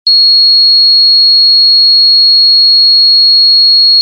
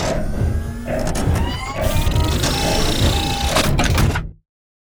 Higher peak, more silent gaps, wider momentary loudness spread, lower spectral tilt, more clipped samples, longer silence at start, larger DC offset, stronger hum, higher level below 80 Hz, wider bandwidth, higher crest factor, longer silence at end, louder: about the same, -2 dBFS vs -4 dBFS; neither; second, 0 LU vs 7 LU; second, 8.5 dB/octave vs -4.5 dB/octave; neither; about the same, 0.05 s vs 0 s; neither; neither; second, under -90 dBFS vs -24 dBFS; second, 13.5 kHz vs over 20 kHz; second, 4 dB vs 16 dB; second, 0 s vs 0.6 s; first, -2 LUFS vs -19 LUFS